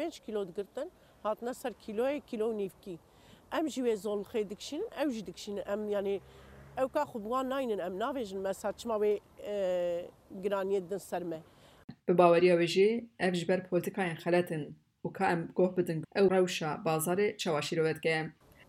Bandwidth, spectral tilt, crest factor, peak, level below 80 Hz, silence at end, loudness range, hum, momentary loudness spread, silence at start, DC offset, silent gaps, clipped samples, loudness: 16 kHz; -5.5 dB/octave; 22 dB; -10 dBFS; -68 dBFS; 0.35 s; 7 LU; none; 13 LU; 0 s; under 0.1%; 11.84-11.88 s; under 0.1%; -32 LUFS